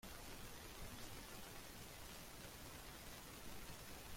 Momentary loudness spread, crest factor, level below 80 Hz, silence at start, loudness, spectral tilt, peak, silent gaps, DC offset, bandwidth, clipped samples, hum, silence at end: 1 LU; 16 dB; -62 dBFS; 0 s; -55 LUFS; -3 dB/octave; -38 dBFS; none; under 0.1%; 16.5 kHz; under 0.1%; none; 0 s